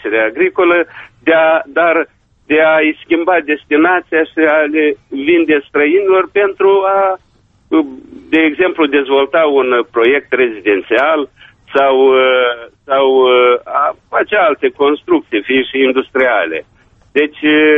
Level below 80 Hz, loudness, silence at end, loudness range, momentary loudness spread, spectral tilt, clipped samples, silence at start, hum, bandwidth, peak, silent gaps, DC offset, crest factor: -54 dBFS; -12 LUFS; 0 s; 2 LU; 7 LU; -6.5 dB/octave; under 0.1%; 0.05 s; none; 3.9 kHz; 0 dBFS; none; under 0.1%; 12 dB